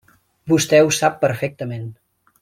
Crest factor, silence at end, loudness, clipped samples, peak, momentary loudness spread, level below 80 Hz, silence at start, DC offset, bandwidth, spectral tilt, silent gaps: 18 dB; 0.5 s; -18 LUFS; under 0.1%; -2 dBFS; 19 LU; -58 dBFS; 0.45 s; under 0.1%; 16.5 kHz; -4.5 dB/octave; none